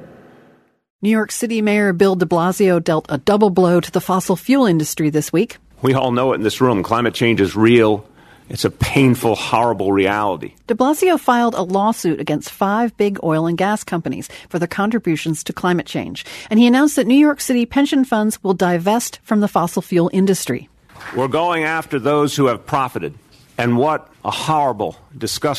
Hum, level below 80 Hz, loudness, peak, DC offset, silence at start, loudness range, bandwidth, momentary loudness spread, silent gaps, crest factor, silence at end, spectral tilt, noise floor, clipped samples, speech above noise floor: none; -48 dBFS; -17 LUFS; 0 dBFS; under 0.1%; 0 s; 4 LU; 13.5 kHz; 10 LU; 0.90-0.99 s; 16 dB; 0 s; -5.5 dB/octave; -52 dBFS; under 0.1%; 36 dB